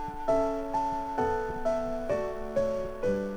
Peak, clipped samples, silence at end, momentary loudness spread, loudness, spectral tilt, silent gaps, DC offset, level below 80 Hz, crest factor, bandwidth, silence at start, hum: -16 dBFS; under 0.1%; 0 s; 4 LU; -31 LUFS; -6.5 dB/octave; none; under 0.1%; -44 dBFS; 14 dB; over 20 kHz; 0 s; none